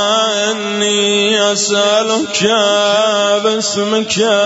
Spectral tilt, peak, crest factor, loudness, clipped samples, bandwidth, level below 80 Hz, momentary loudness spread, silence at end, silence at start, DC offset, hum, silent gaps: -2 dB/octave; 0 dBFS; 12 dB; -13 LUFS; under 0.1%; 8 kHz; -62 dBFS; 4 LU; 0 s; 0 s; under 0.1%; none; none